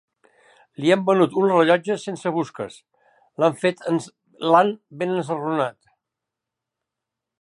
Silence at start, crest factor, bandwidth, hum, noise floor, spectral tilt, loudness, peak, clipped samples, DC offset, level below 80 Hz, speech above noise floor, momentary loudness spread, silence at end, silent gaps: 0.8 s; 20 dB; 11.5 kHz; none; -85 dBFS; -6 dB/octave; -21 LUFS; -4 dBFS; under 0.1%; under 0.1%; -74 dBFS; 64 dB; 11 LU; 1.7 s; none